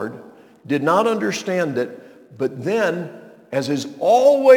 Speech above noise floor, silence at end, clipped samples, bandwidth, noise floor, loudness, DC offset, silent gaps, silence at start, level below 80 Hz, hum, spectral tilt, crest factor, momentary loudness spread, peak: 24 dB; 0 s; under 0.1%; 18 kHz; -42 dBFS; -20 LUFS; under 0.1%; none; 0 s; -72 dBFS; none; -5.5 dB/octave; 18 dB; 15 LU; 0 dBFS